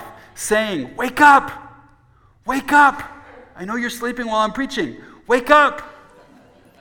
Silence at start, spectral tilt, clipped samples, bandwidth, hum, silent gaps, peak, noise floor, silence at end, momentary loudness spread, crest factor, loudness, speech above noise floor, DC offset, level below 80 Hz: 0 s; -3 dB/octave; under 0.1%; 19.5 kHz; none; none; 0 dBFS; -54 dBFS; 0.9 s; 21 LU; 18 dB; -17 LUFS; 37 dB; under 0.1%; -50 dBFS